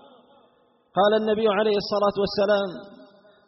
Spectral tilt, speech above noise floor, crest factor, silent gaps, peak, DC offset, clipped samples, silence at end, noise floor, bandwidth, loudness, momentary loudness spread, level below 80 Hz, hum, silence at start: -3 dB/octave; 40 dB; 16 dB; none; -8 dBFS; under 0.1%; under 0.1%; 0.55 s; -62 dBFS; 6 kHz; -23 LUFS; 9 LU; -58 dBFS; none; 0.95 s